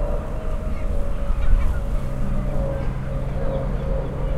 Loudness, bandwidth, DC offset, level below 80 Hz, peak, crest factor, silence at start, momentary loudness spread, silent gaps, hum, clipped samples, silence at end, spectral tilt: -27 LUFS; 4.8 kHz; under 0.1%; -22 dBFS; -4 dBFS; 16 dB; 0 s; 5 LU; none; none; under 0.1%; 0 s; -8 dB/octave